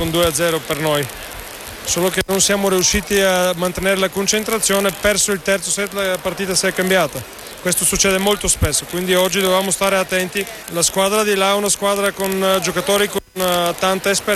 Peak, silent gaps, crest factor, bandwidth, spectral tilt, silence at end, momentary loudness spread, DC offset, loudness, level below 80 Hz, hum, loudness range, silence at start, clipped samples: -4 dBFS; none; 14 dB; 16 kHz; -2.5 dB/octave; 0 s; 6 LU; under 0.1%; -17 LUFS; -38 dBFS; none; 1 LU; 0 s; under 0.1%